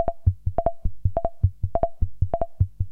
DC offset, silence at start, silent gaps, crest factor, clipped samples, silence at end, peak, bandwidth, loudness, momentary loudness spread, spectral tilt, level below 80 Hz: under 0.1%; 0 s; none; 16 dB; under 0.1%; 0 s; -6 dBFS; 2.4 kHz; -27 LUFS; 3 LU; -12 dB/octave; -30 dBFS